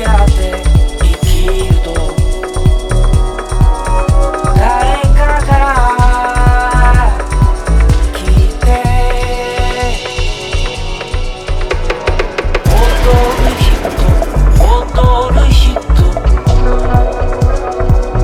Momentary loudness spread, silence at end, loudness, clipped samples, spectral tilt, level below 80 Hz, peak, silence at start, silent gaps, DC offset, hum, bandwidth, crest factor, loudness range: 6 LU; 0 s; -12 LUFS; 0.2%; -6 dB/octave; -10 dBFS; 0 dBFS; 0 s; none; under 0.1%; none; 13.5 kHz; 10 dB; 5 LU